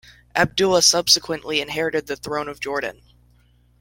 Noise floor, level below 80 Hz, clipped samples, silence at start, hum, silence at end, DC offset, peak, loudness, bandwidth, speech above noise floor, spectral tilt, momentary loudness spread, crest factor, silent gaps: -57 dBFS; -52 dBFS; under 0.1%; 0.35 s; 60 Hz at -50 dBFS; 0.9 s; under 0.1%; -2 dBFS; -19 LUFS; 17 kHz; 36 dB; -2 dB/octave; 13 LU; 20 dB; none